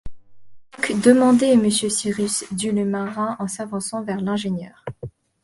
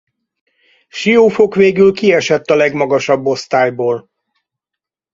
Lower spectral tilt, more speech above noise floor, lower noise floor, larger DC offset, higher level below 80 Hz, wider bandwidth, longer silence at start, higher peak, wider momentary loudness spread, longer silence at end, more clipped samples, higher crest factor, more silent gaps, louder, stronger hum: about the same, -4.5 dB/octave vs -5.5 dB/octave; second, 24 dB vs 71 dB; second, -44 dBFS vs -83 dBFS; neither; first, -50 dBFS vs -56 dBFS; first, 11.5 kHz vs 7.8 kHz; second, 0.05 s vs 0.95 s; about the same, 0 dBFS vs 0 dBFS; first, 17 LU vs 9 LU; second, 0.35 s vs 1.15 s; neither; first, 20 dB vs 14 dB; neither; second, -20 LUFS vs -13 LUFS; neither